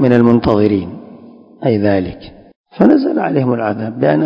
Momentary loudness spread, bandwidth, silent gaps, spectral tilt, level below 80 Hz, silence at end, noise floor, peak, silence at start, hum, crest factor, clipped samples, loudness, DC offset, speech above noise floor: 14 LU; 5.4 kHz; 2.56-2.64 s; -10 dB/octave; -40 dBFS; 0 s; -39 dBFS; 0 dBFS; 0 s; none; 14 dB; 0.4%; -14 LUFS; under 0.1%; 26 dB